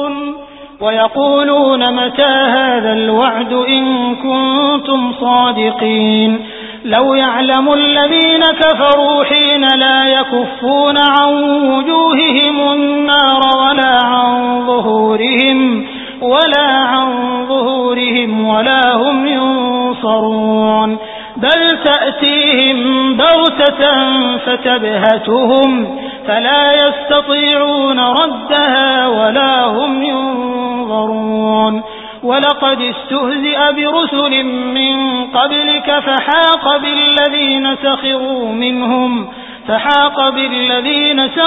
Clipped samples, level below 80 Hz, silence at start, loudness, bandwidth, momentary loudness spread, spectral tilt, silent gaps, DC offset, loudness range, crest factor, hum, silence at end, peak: under 0.1%; -50 dBFS; 0 s; -11 LUFS; 4 kHz; 7 LU; -6.5 dB/octave; none; under 0.1%; 3 LU; 12 dB; none; 0 s; 0 dBFS